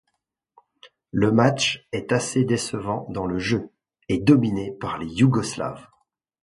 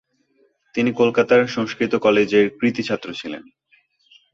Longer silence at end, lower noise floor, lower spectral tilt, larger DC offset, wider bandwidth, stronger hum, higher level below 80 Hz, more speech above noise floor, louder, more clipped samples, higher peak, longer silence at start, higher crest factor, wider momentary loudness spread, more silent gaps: second, 0.6 s vs 0.95 s; first, -77 dBFS vs -62 dBFS; about the same, -5.5 dB/octave vs -6 dB/octave; neither; first, 11.5 kHz vs 7.6 kHz; neither; first, -52 dBFS vs -62 dBFS; first, 55 dB vs 44 dB; second, -23 LUFS vs -19 LUFS; neither; about the same, -2 dBFS vs -4 dBFS; about the same, 0.85 s vs 0.75 s; about the same, 20 dB vs 18 dB; about the same, 12 LU vs 14 LU; neither